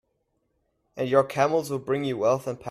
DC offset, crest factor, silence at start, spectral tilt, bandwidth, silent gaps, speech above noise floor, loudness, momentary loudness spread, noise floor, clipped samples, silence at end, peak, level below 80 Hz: under 0.1%; 20 dB; 0.95 s; -6 dB/octave; 14.5 kHz; none; 50 dB; -25 LUFS; 6 LU; -74 dBFS; under 0.1%; 0 s; -6 dBFS; -66 dBFS